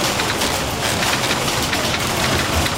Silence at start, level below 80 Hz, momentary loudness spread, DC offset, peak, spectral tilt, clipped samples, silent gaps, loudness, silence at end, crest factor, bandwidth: 0 s; -34 dBFS; 2 LU; 0.2%; -6 dBFS; -3 dB/octave; under 0.1%; none; -18 LUFS; 0 s; 14 dB; 17 kHz